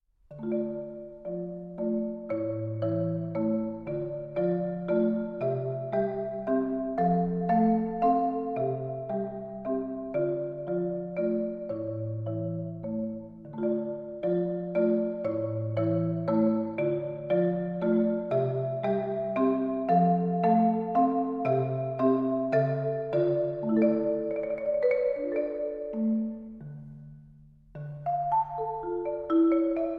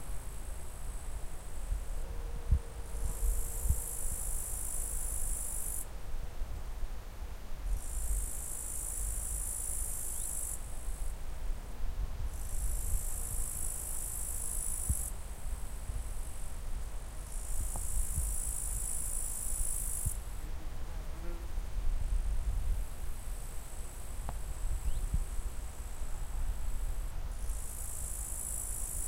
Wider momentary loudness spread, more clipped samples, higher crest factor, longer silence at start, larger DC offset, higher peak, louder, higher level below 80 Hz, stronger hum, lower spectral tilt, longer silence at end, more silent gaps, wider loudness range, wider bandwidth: about the same, 10 LU vs 10 LU; neither; about the same, 16 dB vs 18 dB; first, 0.3 s vs 0 s; second, under 0.1% vs 0.1%; first, -12 dBFS vs -16 dBFS; first, -29 LUFS vs -39 LUFS; second, -60 dBFS vs -36 dBFS; neither; first, -11.5 dB/octave vs -3.5 dB/octave; about the same, 0 s vs 0 s; neither; about the same, 6 LU vs 5 LU; second, 5.2 kHz vs 16 kHz